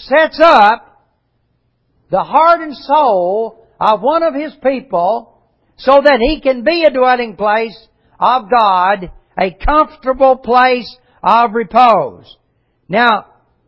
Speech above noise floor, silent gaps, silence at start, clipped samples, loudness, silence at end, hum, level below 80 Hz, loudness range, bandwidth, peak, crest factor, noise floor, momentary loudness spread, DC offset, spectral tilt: 50 dB; none; 0 s; 0.2%; -12 LUFS; 0.45 s; none; -36 dBFS; 2 LU; 8 kHz; 0 dBFS; 12 dB; -62 dBFS; 10 LU; under 0.1%; -6 dB/octave